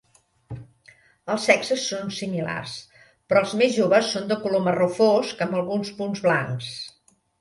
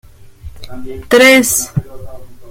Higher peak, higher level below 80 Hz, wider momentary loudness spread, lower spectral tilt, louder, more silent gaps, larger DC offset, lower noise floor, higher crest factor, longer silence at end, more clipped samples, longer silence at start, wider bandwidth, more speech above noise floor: about the same, -2 dBFS vs 0 dBFS; second, -62 dBFS vs -38 dBFS; second, 18 LU vs 24 LU; first, -4.5 dB/octave vs -3 dB/octave; second, -23 LUFS vs -10 LUFS; neither; neither; first, -55 dBFS vs -33 dBFS; first, 22 dB vs 14 dB; first, 0.5 s vs 0 s; neither; first, 0.5 s vs 0.2 s; second, 11.5 kHz vs 17 kHz; first, 33 dB vs 22 dB